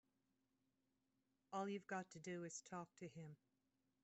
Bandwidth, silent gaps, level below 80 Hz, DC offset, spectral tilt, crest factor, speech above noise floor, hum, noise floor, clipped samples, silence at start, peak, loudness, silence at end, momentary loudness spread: 8 kHz; none; under -90 dBFS; under 0.1%; -5 dB/octave; 20 dB; 36 dB; none; -88 dBFS; under 0.1%; 1.5 s; -34 dBFS; -52 LUFS; 0.7 s; 12 LU